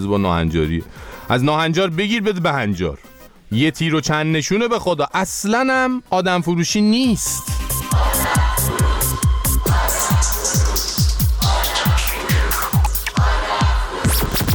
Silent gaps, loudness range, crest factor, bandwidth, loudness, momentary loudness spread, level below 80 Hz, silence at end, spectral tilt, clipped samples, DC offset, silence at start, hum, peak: none; 2 LU; 14 dB; 20 kHz; -18 LUFS; 4 LU; -24 dBFS; 0 s; -4.5 dB/octave; under 0.1%; under 0.1%; 0 s; none; -4 dBFS